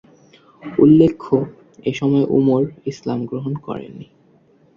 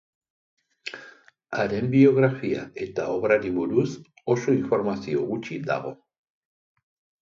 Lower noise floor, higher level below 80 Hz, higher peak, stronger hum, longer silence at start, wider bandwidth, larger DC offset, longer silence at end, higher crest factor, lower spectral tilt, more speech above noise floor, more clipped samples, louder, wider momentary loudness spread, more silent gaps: about the same, -54 dBFS vs -51 dBFS; first, -54 dBFS vs -62 dBFS; first, 0 dBFS vs -6 dBFS; neither; second, 0.65 s vs 0.85 s; about the same, 7.2 kHz vs 7.4 kHz; neither; second, 0.75 s vs 1.25 s; about the same, 18 dB vs 20 dB; about the same, -8.5 dB/octave vs -7.5 dB/octave; first, 37 dB vs 28 dB; neither; first, -18 LUFS vs -24 LUFS; about the same, 18 LU vs 19 LU; neither